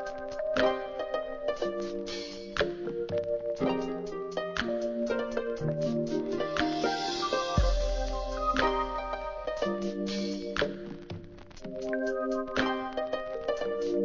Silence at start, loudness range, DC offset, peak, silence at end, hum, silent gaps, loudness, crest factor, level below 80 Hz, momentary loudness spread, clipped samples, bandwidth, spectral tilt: 0 s; 3 LU; under 0.1%; -12 dBFS; 0 s; none; none; -32 LUFS; 20 dB; -42 dBFS; 7 LU; under 0.1%; 7.6 kHz; -5.5 dB/octave